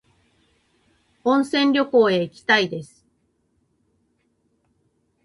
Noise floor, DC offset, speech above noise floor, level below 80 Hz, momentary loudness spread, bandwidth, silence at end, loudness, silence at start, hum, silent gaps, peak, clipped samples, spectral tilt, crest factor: -68 dBFS; under 0.1%; 49 dB; -66 dBFS; 10 LU; 11.5 kHz; 2.4 s; -19 LUFS; 1.25 s; none; none; -4 dBFS; under 0.1%; -5 dB/octave; 20 dB